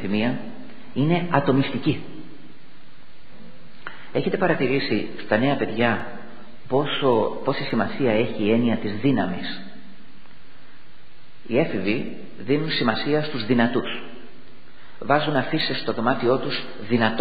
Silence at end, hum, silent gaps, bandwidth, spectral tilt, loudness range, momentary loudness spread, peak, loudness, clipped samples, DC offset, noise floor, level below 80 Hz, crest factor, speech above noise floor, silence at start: 0 s; none; none; 5 kHz; -9 dB/octave; 5 LU; 16 LU; -2 dBFS; -23 LUFS; under 0.1%; 3%; -52 dBFS; -58 dBFS; 20 dB; 30 dB; 0 s